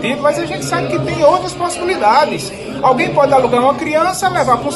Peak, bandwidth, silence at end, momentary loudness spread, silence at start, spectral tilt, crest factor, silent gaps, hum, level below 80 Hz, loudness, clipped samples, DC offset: 0 dBFS; 12.5 kHz; 0 s; 7 LU; 0 s; -4.5 dB/octave; 14 dB; none; none; -44 dBFS; -14 LUFS; under 0.1%; under 0.1%